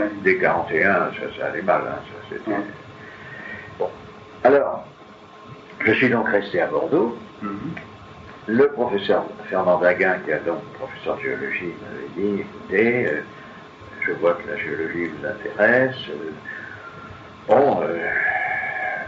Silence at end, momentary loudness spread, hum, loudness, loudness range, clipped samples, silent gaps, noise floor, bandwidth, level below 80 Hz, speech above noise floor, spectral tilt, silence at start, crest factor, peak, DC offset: 0 s; 20 LU; none; -21 LUFS; 3 LU; under 0.1%; none; -44 dBFS; 7.4 kHz; -58 dBFS; 23 dB; -4 dB/octave; 0 s; 20 dB; -2 dBFS; under 0.1%